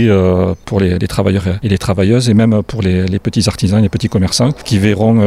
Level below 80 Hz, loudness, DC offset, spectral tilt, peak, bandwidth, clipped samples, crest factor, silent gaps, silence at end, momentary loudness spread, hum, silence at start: -34 dBFS; -13 LUFS; under 0.1%; -6.5 dB/octave; -2 dBFS; 14 kHz; under 0.1%; 10 dB; none; 0 s; 5 LU; none; 0 s